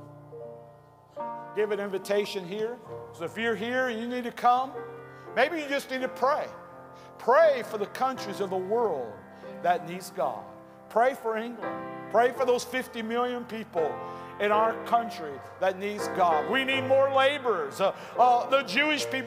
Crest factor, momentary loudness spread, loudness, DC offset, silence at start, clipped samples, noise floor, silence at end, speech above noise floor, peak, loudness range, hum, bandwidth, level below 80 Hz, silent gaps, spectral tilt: 18 dB; 17 LU; -27 LUFS; under 0.1%; 0 s; under 0.1%; -53 dBFS; 0 s; 26 dB; -10 dBFS; 6 LU; none; 16 kHz; -76 dBFS; none; -4 dB/octave